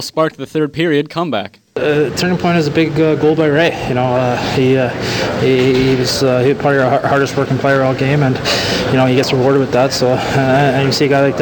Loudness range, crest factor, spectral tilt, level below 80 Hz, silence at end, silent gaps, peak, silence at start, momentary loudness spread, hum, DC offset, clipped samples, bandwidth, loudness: 1 LU; 12 dB; -5.5 dB/octave; -42 dBFS; 0 s; none; 0 dBFS; 0 s; 5 LU; none; under 0.1%; under 0.1%; 19 kHz; -14 LUFS